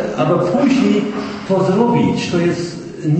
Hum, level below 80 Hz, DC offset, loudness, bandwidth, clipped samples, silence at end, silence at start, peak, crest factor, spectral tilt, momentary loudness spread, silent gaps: none; -50 dBFS; under 0.1%; -16 LUFS; 8.8 kHz; under 0.1%; 0 s; 0 s; 0 dBFS; 16 dB; -7 dB/octave; 10 LU; none